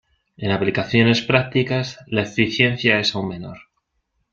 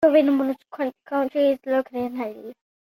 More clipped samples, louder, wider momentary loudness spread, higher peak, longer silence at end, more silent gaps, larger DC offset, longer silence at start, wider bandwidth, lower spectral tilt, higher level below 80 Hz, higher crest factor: neither; first, -19 LUFS vs -24 LUFS; about the same, 12 LU vs 13 LU; first, -2 dBFS vs -6 dBFS; first, 0.75 s vs 0.4 s; neither; neither; first, 0.4 s vs 0 s; second, 7.6 kHz vs 16 kHz; about the same, -5.5 dB/octave vs -6.5 dB/octave; first, -52 dBFS vs -70 dBFS; about the same, 18 dB vs 18 dB